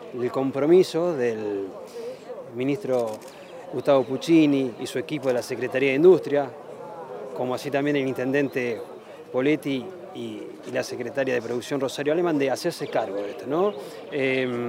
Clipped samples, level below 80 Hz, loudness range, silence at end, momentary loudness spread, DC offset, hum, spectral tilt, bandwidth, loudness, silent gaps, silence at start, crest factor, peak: under 0.1%; -74 dBFS; 6 LU; 0 s; 18 LU; under 0.1%; none; -6 dB/octave; 16 kHz; -24 LUFS; none; 0 s; 18 dB; -6 dBFS